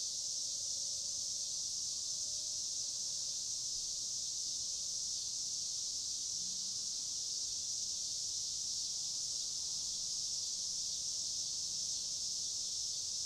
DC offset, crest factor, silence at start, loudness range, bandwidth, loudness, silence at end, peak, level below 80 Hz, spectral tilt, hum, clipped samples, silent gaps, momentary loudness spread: under 0.1%; 14 dB; 0 s; 0 LU; 16 kHz; -37 LUFS; 0 s; -26 dBFS; -70 dBFS; 1.5 dB/octave; none; under 0.1%; none; 1 LU